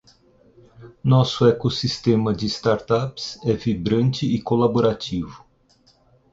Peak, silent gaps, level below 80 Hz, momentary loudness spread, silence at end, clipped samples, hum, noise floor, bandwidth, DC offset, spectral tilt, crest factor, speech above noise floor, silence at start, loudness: -4 dBFS; none; -48 dBFS; 9 LU; 0.95 s; under 0.1%; none; -59 dBFS; 7.8 kHz; under 0.1%; -7 dB/octave; 18 dB; 38 dB; 0.8 s; -21 LUFS